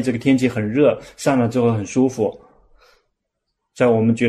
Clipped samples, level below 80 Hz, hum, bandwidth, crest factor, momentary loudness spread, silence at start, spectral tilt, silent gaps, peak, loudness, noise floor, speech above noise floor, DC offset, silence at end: under 0.1%; -54 dBFS; none; 13 kHz; 16 dB; 5 LU; 0 s; -6.5 dB/octave; none; -2 dBFS; -18 LUFS; -76 dBFS; 59 dB; under 0.1%; 0 s